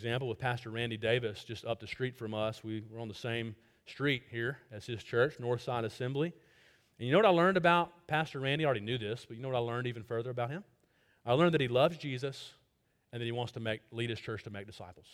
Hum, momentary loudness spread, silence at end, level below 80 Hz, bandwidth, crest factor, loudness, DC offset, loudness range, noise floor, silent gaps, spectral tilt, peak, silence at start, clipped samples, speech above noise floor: none; 16 LU; 0.1 s; -68 dBFS; 14.5 kHz; 22 dB; -34 LUFS; under 0.1%; 7 LU; -75 dBFS; none; -6.5 dB/octave; -12 dBFS; 0 s; under 0.1%; 42 dB